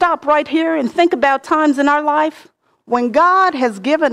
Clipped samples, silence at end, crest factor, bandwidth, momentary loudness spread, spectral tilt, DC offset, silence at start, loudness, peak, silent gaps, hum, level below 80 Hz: under 0.1%; 0 s; 12 dB; 11.5 kHz; 6 LU; -4.5 dB/octave; under 0.1%; 0 s; -15 LUFS; -2 dBFS; none; none; -58 dBFS